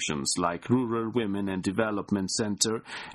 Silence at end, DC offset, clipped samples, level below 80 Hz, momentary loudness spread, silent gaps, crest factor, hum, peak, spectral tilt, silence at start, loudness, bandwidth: 0 s; under 0.1%; under 0.1%; -60 dBFS; 3 LU; none; 20 dB; none; -8 dBFS; -4 dB/octave; 0 s; -28 LUFS; 12 kHz